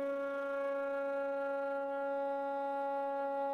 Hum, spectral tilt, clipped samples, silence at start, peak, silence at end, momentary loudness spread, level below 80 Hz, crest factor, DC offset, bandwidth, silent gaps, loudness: none; -5 dB/octave; under 0.1%; 0 s; -28 dBFS; 0 s; 1 LU; -82 dBFS; 8 dB; under 0.1%; 5.6 kHz; none; -37 LUFS